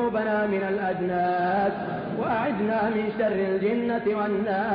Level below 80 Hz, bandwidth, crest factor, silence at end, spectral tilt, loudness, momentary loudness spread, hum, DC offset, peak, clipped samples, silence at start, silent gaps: -58 dBFS; 5.2 kHz; 10 dB; 0 s; -10.5 dB/octave; -25 LUFS; 3 LU; none; under 0.1%; -14 dBFS; under 0.1%; 0 s; none